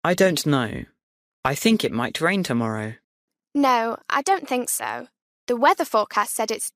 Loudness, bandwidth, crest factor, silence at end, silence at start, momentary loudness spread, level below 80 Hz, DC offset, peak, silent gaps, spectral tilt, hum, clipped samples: -22 LUFS; 15.5 kHz; 18 dB; 0.05 s; 0.05 s; 11 LU; -58 dBFS; under 0.1%; -6 dBFS; 1.03-1.43 s, 3.04-3.28 s, 5.22-5.47 s; -4 dB/octave; none; under 0.1%